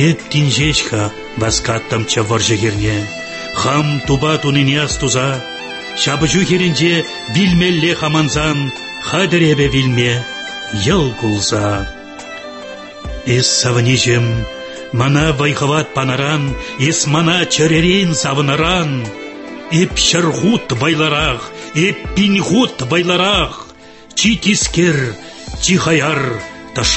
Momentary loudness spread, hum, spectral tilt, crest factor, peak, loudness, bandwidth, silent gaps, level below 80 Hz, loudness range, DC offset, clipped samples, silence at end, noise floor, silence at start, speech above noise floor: 12 LU; none; -4 dB/octave; 14 dB; 0 dBFS; -14 LUFS; 8.6 kHz; none; -34 dBFS; 2 LU; under 0.1%; under 0.1%; 0 s; -38 dBFS; 0 s; 24 dB